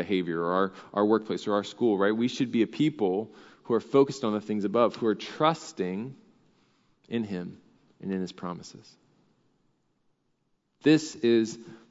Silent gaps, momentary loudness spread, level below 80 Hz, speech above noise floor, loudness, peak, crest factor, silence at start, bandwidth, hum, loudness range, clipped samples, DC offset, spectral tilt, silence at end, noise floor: none; 14 LU; -78 dBFS; 47 dB; -28 LUFS; -8 dBFS; 20 dB; 0 s; 7.8 kHz; none; 11 LU; under 0.1%; under 0.1%; -6 dB/octave; 0.15 s; -74 dBFS